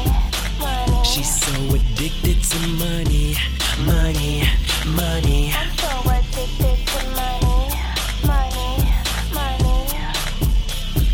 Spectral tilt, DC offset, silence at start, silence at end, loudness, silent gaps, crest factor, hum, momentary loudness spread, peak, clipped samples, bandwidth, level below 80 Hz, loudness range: -4 dB/octave; under 0.1%; 0 s; 0 s; -20 LUFS; none; 14 dB; none; 4 LU; -4 dBFS; under 0.1%; 17.5 kHz; -20 dBFS; 2 LU